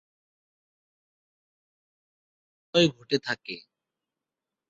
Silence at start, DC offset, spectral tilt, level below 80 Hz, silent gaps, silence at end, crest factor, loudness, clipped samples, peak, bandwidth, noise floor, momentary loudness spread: 2.75 s; under 0.1%; -3.5 dB/octave; -70 dBFS; none; 1.1 s; 26 dB; -26 LUFS; under 0.1%; -8 dBFS; 7.6 kHz; -89 dBFS; 16 LU